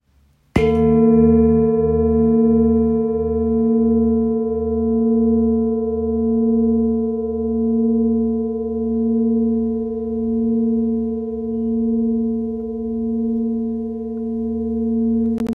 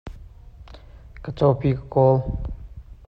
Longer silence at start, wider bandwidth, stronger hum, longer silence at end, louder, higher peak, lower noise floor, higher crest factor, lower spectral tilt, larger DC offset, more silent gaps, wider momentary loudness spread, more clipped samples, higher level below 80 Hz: first, 0.55 s vs 0.05 s; second, 3.3 kHz vs 5.6 kHz; neither; second, 0 s vs 0.15 s; first, -18 LUFS vs -21 LUFS; about the same, -2 dBFS vs -4 dBFS; first, -57 dBFS vs -43 dBFS; about the same, 16 dB vs 20 dB; about the same, -10.5 dB/octave vs -10.5 dB/octave; neither; neither; second, 9 LU vs 23 LU; neither; about the same, -38 dBFS vs -38 dBFS